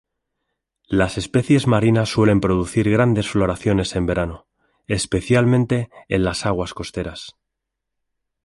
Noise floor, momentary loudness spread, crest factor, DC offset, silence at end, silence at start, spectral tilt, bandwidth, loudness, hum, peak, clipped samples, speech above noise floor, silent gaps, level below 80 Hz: -80 dBFS; 11 LU; 18 dB; under 0.1%; 1.15 s; 0.9 s; -6 dB/octave; 11.5 kHz; -19 LUFS; none; -2 dBFS; under 0.1%; 62 dB; none; -40 dBFS